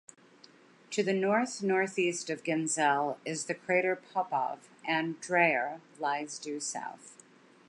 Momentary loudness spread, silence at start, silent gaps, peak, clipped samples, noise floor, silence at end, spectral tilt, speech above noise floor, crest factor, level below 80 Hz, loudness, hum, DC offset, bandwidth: 10 LU; 0.9 s; none; -12 dBFS; under 0.1%; -59 dBFS; 0.55 s; -3.5 dB/octave; 27 dB; 20 dB; -86 dBFS; -31 LUFS; none; under 0.1%; 11.5 kHz